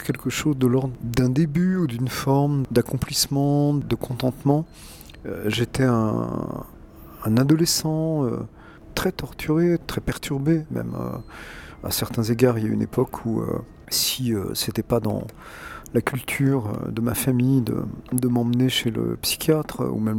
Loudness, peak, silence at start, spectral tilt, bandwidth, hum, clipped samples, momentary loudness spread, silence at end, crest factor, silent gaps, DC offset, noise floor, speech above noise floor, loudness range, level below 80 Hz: -23 LUFS; -4 dBFS; 0 s; -5.5 dB/octave; 18.5 kHz; none; under 0.1%; 12 LU; 0 s; 20 dB; none; under 0.1%; -43 dBFS; 20 dB; 3 LU; -46 dBFS